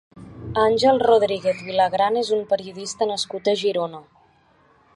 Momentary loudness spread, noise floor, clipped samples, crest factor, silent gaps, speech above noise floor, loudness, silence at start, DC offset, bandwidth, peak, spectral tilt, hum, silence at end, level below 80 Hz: 10 LU; -58 dBFS; under 0.1%; 18 dB; none; 37 dB; -21 LUFS; 0.15 s; under 0.1%; 11.5 kHz; -4 dBFS; -4 dB/octave; none; 0.95 s; -54 dBFS